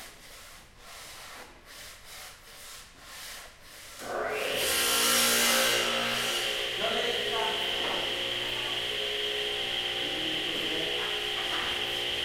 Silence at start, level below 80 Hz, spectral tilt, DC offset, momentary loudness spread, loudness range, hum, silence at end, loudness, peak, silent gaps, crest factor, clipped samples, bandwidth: 0 s; -58 dBFS; -0.5 dB/octave; under 0.1%; 23 LU; 19 LU; none; 0 s; -27 LUFS; -12 dBFS; none; 18 dB; under 0.1%; 16.5 kHz